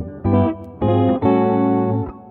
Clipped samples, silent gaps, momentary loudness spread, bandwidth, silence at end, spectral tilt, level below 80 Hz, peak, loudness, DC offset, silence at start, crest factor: under 0.1%; none; 6 LU; 4.2 kHz; 0 s; -11.5 dB/octave; -42 dBFS; -4 dBFS; -18 LUFS; under 0.1%; 0 s; 14 dB